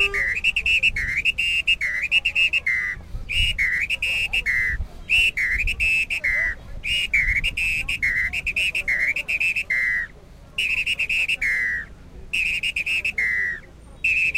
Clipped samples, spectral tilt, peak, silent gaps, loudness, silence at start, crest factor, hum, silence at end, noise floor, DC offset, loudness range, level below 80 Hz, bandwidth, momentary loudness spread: under 0.1%; -1 dB/octave; -8 dBFS; none; -20 LUFS; 0 s; 16 dB; none; 0 s; -44 dBFS; under 0.1%; 3 LU; -36 dBFS; 16.5 kHz; 7 LU